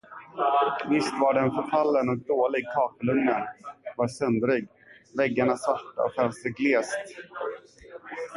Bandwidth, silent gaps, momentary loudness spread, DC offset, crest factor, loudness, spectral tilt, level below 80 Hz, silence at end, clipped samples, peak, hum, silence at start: 11.5 kHz; none; 14 LU; under 0.1%; 16 dB; -26 LUFS; -6 dB/octave; -66 dBFS; 0 s; under 0.1%; -10 dBFS; none; 0.1 s